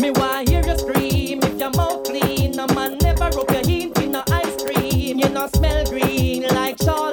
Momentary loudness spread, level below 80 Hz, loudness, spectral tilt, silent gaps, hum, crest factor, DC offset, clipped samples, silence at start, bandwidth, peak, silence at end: 2 LU; -26 dBFS; -20 LUFS; -5.5 dB/octave; none; none; 14 dB; under 0.1%; under 0.1%; 0 s; over 20 kHz; -4 dBFS; 0 s